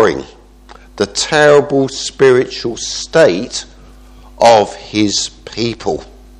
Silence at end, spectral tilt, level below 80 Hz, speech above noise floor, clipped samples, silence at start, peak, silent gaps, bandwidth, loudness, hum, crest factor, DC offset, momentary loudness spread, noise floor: 0.35 s; -3.5 dB/octave; -40 dBFS; 27 dB; 0.2%; 0 s; 0 dBFS; none; 11.5 kHz; -13 LUFS; none; 14 dB; under 0.1%; 12 LU; -39 dBFS